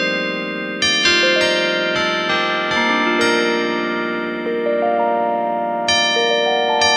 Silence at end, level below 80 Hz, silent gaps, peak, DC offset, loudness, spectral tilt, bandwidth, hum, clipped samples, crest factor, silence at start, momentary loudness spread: 0 s; -56 dBFS; none; 0 dBFS; under 0.1%; -17 LUFS; -2.5 dB/octave; 12.5 kHz; none; under 0.1%; 16 dB; 0 s; 8 LU